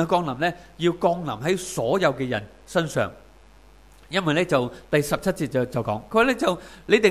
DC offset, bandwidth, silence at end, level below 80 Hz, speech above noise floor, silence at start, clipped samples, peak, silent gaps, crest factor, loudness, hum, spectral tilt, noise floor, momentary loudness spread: 0.1%; 15.5 kHz; 0 s; -52 dBFS; 28 dB; 0 s; under 0.1%; -4 dBFS; none; 20 dB; -24 LUFS; none; -5 dB/octave; -51 dBFS; 7 LU